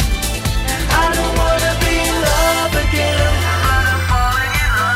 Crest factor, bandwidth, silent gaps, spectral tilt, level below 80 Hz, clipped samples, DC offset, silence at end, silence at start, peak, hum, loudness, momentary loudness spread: 14 dB; 16.5 kHz; none; -4 dB/octave; -20 dBFS; under 0.1%; under 0.1%; 0 s; 0 s; 0 dBFS; none; -15 LUFS; 4 LU